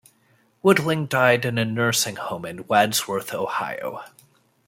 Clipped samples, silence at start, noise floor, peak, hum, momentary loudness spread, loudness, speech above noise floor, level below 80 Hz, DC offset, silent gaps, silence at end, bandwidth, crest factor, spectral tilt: under 0.1%; 0.65 s; -62 dBFS; -2 dBFS; none; 12 LU; -22 LUFS; 40 dB; -64 dBFS; under 0.1%; none; 0.6 s; 16.5 kHz; 20 dB; -4 dB/octave